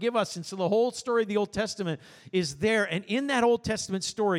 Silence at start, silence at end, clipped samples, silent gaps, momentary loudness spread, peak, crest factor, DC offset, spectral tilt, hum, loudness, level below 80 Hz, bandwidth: 0 s; 0 s; under 0.1%; none; 7 LU; -12 dBFS; 14 dB; under 0.1%; -4.5 dB/octave; none; -28 LUFS; -58 dBFS; 13.5 kHz